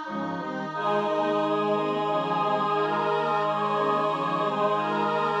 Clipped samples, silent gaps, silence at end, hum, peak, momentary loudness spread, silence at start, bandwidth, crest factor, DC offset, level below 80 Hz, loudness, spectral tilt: under 0.1%; none; 0 s; none; -12 dBFS; 4 LU; 0 s; 10.5 kHz; 14 dB; under 0.1%; -72 dBFS; -26 LUFS; -6.5 dB/octave